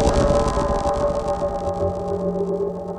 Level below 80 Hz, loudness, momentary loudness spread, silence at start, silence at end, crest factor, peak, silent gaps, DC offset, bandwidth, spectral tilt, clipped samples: -30 dBFS; -22 LUFS; 6 LU; 0 s; 0 s; 16 dB; -6 dBFS; none; under 0.1%; 11.5 kHz; -6.5 dB/octave; under 0.1%